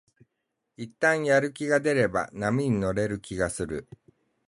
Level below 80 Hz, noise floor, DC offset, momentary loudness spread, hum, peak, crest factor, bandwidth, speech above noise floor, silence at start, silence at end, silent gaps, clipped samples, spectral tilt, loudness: -52 dBFS; -81 dBFS; under 0.1%; 11 LU; none; -10 dBFS; 18 dB; 11.5 kHz; 55 dB; 0.8 s; 0.65 s; none; under 0.1%; -5.5 dB/octave; -26 LUFS